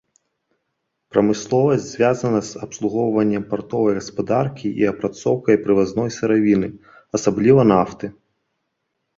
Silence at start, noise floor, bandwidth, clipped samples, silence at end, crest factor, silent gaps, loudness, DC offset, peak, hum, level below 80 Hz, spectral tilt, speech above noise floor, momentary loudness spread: 1.15 s; -75 dBFS; 7.8 kHz; under 0.1%; 1.05 s; 18 dB; none; -19 LUFS; under 0.1%; -2 dBFS; none; -54 dBFS; -6.5 dB/octave; 57 dB; 9 LU